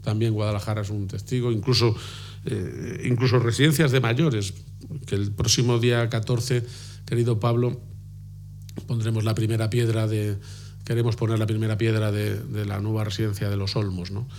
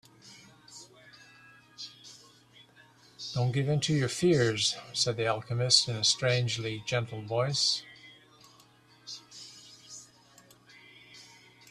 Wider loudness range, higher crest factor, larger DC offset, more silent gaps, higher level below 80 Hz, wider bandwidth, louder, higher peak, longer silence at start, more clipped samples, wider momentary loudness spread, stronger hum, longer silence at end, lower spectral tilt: second, 4 LU vs 22 LU; second, 18 dB vs 24 dB; neither; neither; first, -50 dBFS vs -66 dBFS; first, 16.5 kHz vs 13 kHz; first, -24 LUFS vs -28 LUFS; about the same, -6 dBFS vs -8 dBFS; second, 0 s vs 0.25 s; neither; second, 16 LU vs 25 LU; first, 50 Hz at -45 dBFS vs none; second, 0 s vs 0.45 s; first, -5.5 dB/octave vs -3.5 dB/octave